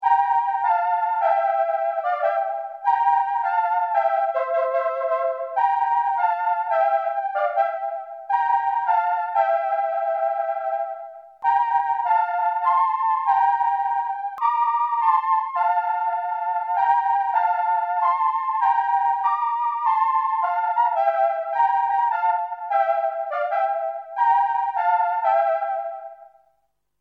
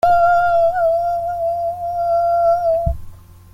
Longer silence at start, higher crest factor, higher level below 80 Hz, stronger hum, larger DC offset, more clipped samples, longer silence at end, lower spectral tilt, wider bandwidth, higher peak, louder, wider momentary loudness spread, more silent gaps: about the same, 0 s vs 0.05 s; about the same, 14 dB vs 12 dB; second, -84 dBFS vs -34 dBFS; first, 50 Hz at -85 dBFS vs none; neither; neither; first, 0.75 s vs 0.35 s; second, -0.5 dB/octave vs -6.5 dB/octave; second, 5 kHz vs 14.5 kHz; second, -8 dBFS vs -4 dBFS; second, -22 LUFS vs -17 LUFS; about the same, 6 LU vs 8 LU; neither